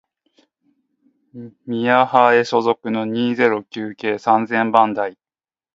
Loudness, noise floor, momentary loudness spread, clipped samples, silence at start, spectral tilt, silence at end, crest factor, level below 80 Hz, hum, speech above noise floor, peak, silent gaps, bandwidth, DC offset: -17 LUFS; under -90 dBFS; 14 LU; under 0.1%; 1.35 s; -6 dB/octave; 0.6 s; 20 dB; -68 dBFS; none; over 73 dB; 0 dBFS; none; 7.8 kHz; under 0.1%